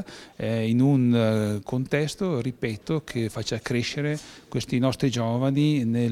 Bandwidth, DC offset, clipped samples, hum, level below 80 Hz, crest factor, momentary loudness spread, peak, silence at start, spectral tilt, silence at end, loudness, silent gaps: 14.5 kHz; under 0.1%; under 0.1%; none; -56 dBFS; 16 dB; 9 LU; -8 dBFS; 0 s; -6.5 dB/octave; 0 s; -25 LUFS; none